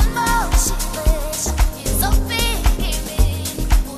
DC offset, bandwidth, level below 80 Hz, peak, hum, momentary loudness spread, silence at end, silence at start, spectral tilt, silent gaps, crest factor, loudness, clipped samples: under 0.1%; 15.5 kHz; -18 dBFS; -2 dBFS; none; 4 LU; 0 s; 0 s; -3.5 dB/octave; none; 14 dB; -20 LUFS; under 0.1%